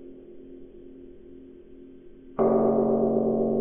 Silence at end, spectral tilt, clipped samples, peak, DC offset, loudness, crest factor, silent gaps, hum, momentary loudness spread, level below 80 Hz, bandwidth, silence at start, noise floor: 0 s; -11 dB/octave; under 0.1%; -12 dBFS; under 0.1%; -24 LUFS; 16 dB; none; none; 25 LU; -52 dBFS; 3.2 kHz; 0 s; -47 dBFS